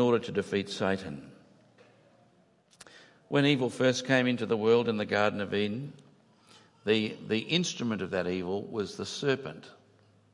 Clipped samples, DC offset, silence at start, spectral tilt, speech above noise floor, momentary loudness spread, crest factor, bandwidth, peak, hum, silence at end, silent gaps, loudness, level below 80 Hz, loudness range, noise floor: under 0.1%; under 0.1%; 0 s; -5 dB/octave; 36 dB; 10 LU; 22 dB; 11.5 kHz; -10 dBFS; none; 0.6 s; none; -29 LUFS; -74 dBFS; 5 LU; -65 dBFS